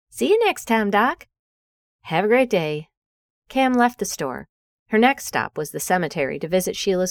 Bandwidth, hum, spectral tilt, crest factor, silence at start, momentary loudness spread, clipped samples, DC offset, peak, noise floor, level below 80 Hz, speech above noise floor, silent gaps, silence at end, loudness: over 20 kHz; none; -4 dB/octave; 18 dB; 0.15 s; 10 LU; under 0.1%; under 0.1%; -4 dBFS; under -90 dBFS; -56 dBFS; over 70 dB; 1.39-1.99 s, 2.97-3.42 s, 4.49-4.86 s; 0 s; -21 LUFS